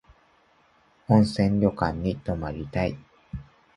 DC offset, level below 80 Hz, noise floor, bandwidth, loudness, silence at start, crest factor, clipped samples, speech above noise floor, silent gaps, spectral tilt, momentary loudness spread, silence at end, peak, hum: under 0.1%; -44 dBFS; -62 dBFS; 11 kHz; -25 LUFS; 1.1 s; 22 dB; under 0.1%; 38 dB; none; -8 dB/octave; 20 LU; 0.35 s; -6 dBFS; none